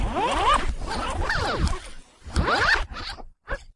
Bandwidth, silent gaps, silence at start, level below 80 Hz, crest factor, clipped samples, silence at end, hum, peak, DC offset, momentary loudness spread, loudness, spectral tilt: 11.5 kHz; none; 0 s; -32 dBFS; 18 dB; under 0.1%; 0.05 s; none; -8 dBFS; under 0.1%; 16 LU; -24 LUFS; -4 dB/octave